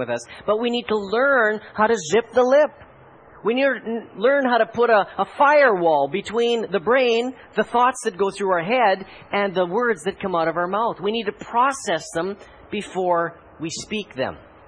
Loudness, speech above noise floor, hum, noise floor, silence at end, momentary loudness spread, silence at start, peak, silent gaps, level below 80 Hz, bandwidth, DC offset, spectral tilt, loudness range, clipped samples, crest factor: -21 LUFS; 27 dB; none; -47 dBFS; 0.3 s; 11 LU; 0 s; -4 dBFS; none; -60 dBFS; 10.5 kHz; under 0.1%; -4 dB/octave; 5 LU; under 0.1%; 16 dB